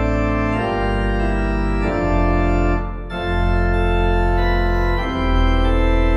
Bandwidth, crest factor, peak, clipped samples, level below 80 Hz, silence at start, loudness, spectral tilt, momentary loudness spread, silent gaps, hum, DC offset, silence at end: 7.2 kHz; 12 dB; -6 dBFS; under 0.1%; -20 dBFS; 0 s; -19 LUFS; -7.5 dB/octave; 3 LU; none; none; under 0.1%; 0 s